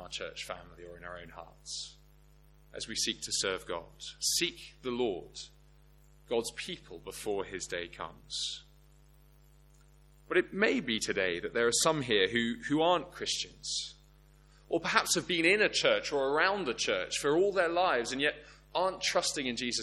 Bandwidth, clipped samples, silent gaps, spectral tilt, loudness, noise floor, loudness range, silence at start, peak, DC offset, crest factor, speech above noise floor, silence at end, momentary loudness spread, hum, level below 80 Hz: 14 kHz; under 0.1%; none; -2.5 dB/octave; -31 LUFS; -60 dBFS; 10 LU; 0 s; -8 dBFS; under 0.1%; 26 dB; 28 dB; 0 s; 17 LU; 50 Hz at -60 dBFS; -60 dBFS